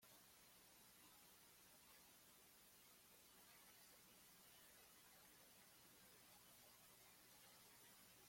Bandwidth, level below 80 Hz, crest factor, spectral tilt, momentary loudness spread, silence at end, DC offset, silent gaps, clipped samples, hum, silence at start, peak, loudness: 16.5 kHz; under -90 dBFS; 16 dB; -1.5 dB/octave; 2 LU; 0 s; under 0.1%; none; under 0.1%; none; 0 s; -54 dBFS; -67 LUFS